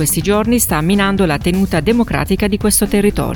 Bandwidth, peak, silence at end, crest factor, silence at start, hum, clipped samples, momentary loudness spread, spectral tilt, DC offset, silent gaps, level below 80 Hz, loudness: 19.5 kHz; 0 dBFS; 0 s; 14 dB; 0 s; none; under 0.1%; 3 LU; -4.5 dB/octave; under 0.1%; none; -28 dBFS; -14 LUFS